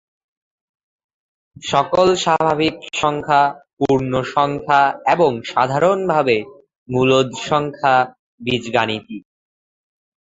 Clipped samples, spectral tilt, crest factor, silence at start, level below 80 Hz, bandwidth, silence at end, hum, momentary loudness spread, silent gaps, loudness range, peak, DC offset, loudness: under 0.1%; -5 dB/octave; 18 dB; 1.6 s; -52 dBFS; 8 kHz; 1.1 s; none; 9 LU; 3.73-3.77 s, 6.78-6.86 s, 8.19-8.38 s; 3 LU; 0 dBFS; under 0.1%; -17 LUFS